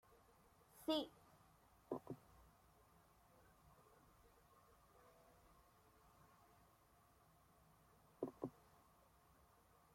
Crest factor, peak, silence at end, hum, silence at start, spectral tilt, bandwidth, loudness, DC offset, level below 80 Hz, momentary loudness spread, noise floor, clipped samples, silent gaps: 26 dB; -30 dBFS; 1.15 s; none; 0.1 s; -5 dB/octave; 16.5 kHz; -49 LUFS; under 0.1%; -80 dBFS; 15 LU; -73 dBFS; under 0.1%; none